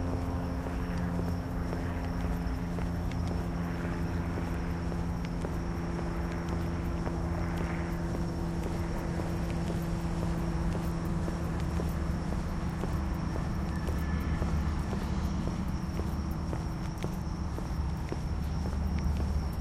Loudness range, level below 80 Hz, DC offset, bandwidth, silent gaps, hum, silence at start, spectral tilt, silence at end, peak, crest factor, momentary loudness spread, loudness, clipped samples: 1 LU; -36 dBFS; under 0.1%; 15.5 kHz; none; none; 0 s; -7.5 dB/octave; 0 s; -18 dBFS; 14 dB; 2 LU; -34 LUFS; under 0.1%